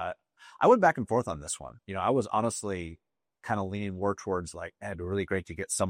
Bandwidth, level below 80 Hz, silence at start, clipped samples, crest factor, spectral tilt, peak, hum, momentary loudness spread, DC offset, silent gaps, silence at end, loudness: 15.5 kHz; -60 dBFS; 0 s; under 0.1%; 20 dB; -5 dB/octave; -8 dBFS; none; 16 LU; under 0.1%; none; 0 s; -30 LUFS